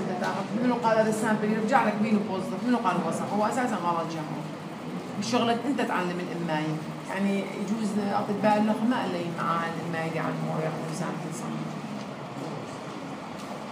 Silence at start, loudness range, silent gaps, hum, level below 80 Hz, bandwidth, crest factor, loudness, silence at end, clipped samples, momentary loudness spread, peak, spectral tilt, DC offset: 0 s; 6 LU; none; none; -72 dBFS; 15.5 kHz; 18 dB; -28 LUFS; 0 s; under 0.1%; 13 LU; -8 dBFS; -6 dB/octave; under 0.1%